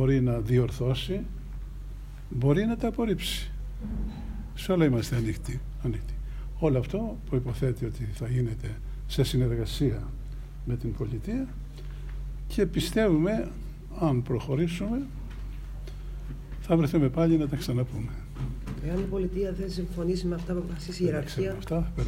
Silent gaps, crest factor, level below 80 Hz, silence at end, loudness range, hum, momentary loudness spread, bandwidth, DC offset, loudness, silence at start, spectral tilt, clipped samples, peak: none; 18 dB; -38 dBFS; 0 s; 3 LU; none; 16 LU; 16 kHz; under 0.1%; -29 LUFS; 0 s; -7 dB/octave; under 0.1%; -10 dBFS